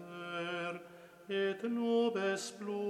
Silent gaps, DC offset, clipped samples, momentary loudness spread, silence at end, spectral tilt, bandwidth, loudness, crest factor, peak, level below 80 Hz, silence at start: none; under 0.1%; under 0.1%; 14 LU; 0 s; -4.5 dB/octave; 14.5 kHz; -36 LUFS; 16 dB; -20 dBFS; -86 dBFS; 0 s